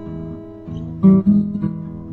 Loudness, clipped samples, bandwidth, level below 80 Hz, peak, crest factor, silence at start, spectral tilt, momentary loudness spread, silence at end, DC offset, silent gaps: -16 LUFS; under 0.1%; 3.1 kHz; -44 dBFS; -2 dBFS; 16 dB; 0 s; -12.5 dB/octave; 19 LU; 0 s; under 0.1%; none